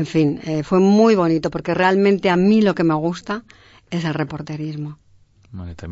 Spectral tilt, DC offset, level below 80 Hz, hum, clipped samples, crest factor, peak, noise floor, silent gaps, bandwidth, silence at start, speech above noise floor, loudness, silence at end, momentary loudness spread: -7 dB/octave; under 0.1%; -50 dBFS; none; under 0.1%; 16 dB; -2 dBFS; -52 dBFS; none; 8 kHz; 0 s; 34 dB; -18 LUFS; 0 s; 15 LU